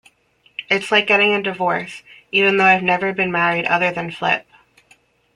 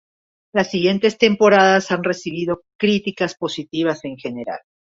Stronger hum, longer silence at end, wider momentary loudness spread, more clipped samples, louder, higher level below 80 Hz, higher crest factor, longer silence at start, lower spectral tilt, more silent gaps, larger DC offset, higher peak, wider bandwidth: neither; first, 0.95 s vs 0.4 s; second, 11 LU vs 15 LU; neither; about the same, -17 LUFS vs -19 LUFS; about the same, -62 dBFS vs -60 dBFS; about the same, 18 dB vs 18 dB; about the same, 0.6 s vs 0.55 s; about the same, -4.5 dB/octave vs -5 dB/octave; second, none vs 2.75-2.79 s; neither; about the same, -2 dBFS vs -2 dBFS; first, 11 kHz vs 7.8 kHz